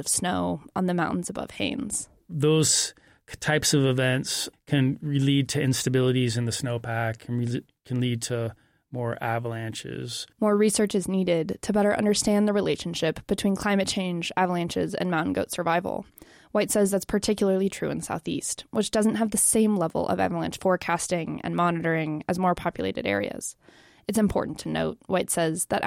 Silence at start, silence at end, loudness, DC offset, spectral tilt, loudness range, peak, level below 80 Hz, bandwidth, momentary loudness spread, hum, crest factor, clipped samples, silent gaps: 0 s; 0 s; -26 LUFS; under 0.1%; -4.5 dB/octave; 4 LU; -10 dBFS; -54 dBFS; 16.5 kHz; 9 LU; none; 16 dB; under 0.1%; none